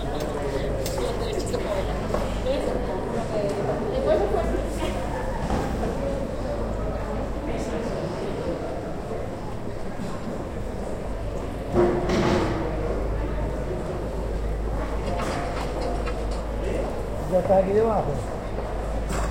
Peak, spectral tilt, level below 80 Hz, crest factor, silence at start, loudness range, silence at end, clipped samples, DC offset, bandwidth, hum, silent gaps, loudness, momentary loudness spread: -8 dBFS; -6.5 dB/octave; -32 dBFS; 18 dB; 0 s; 5 LU; 0 s; under 0.1%; under 0.1%; 16.5 kHz; none; none; -27 LUFS; 10 LU